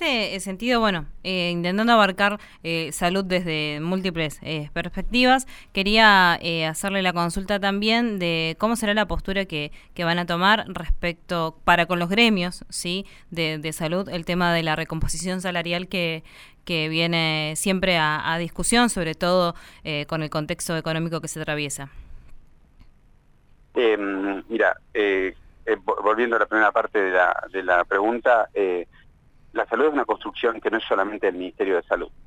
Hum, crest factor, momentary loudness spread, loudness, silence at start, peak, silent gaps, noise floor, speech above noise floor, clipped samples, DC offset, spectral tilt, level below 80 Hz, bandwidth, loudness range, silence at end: none; 22 dB; 9 LU; -22 LUFS; 0 s; -2 dBFS; none; -55 dBFS; 32 dB; under 0.1%; under 0.1%; -4 dB/octave; -40 dBFS; 18 kHz; 6 LU; 0 s